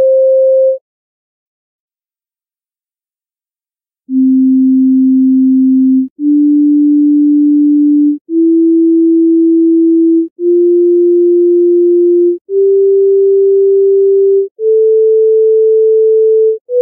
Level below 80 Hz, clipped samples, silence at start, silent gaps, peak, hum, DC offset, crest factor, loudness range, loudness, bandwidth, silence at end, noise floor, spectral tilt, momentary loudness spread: -80 dBFS; under 0.1%; 0 s; 0.81-1.88 s, 6.10-6.16 s, 8.21-8.25 s, 10.31-10.36 s, 12.41-12.45 s, 14.51-14.56 s, 16.61-16.65 s; -4 dBFS; none; under 0.1%; 4 dB; 6 LU; -9 LUFS; 0.6 kHz; 0 s; under -90 dBFS; -17.5 dB/octave; 4 LU